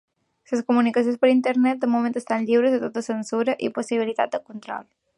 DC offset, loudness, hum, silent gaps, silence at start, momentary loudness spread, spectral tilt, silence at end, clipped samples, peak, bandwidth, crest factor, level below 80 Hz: under 0.1%; -22 LUFS; none; none; 0.5 s; 11 LU; -5 dB/octave; 0.35 s; under 0.1%; -6 dBFS; 11 kHz; 16 dB; -74 dBFS